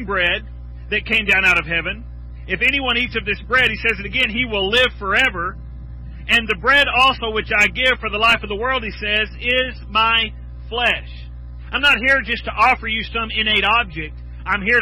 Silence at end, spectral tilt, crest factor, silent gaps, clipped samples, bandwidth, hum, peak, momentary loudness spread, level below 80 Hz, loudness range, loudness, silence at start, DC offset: 0 s; -4 dB/octave; 14 dB; none; under 0.1%; 18 kHz; 60 Hz at -35 dBFS; -6 dBFS; 18 LU; -34 dBFS; 2 LU; -17 LUFS; 0 s; under 0.1%